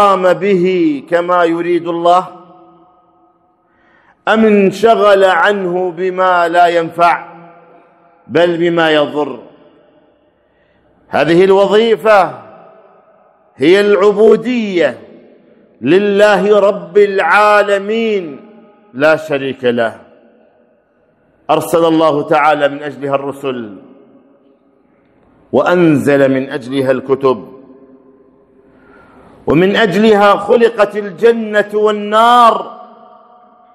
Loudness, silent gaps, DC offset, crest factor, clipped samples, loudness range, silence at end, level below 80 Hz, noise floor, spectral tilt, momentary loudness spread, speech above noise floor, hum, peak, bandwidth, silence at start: -11 LUFS; none; under 0.1%; 12 dB; 0.4%; 6 LU; 0.9 s; -54 dBFS; -54 dBFS; -6 dB/octave; 11 LU; 44 dB; none; 0 dBFS; 14 kHz; 0 s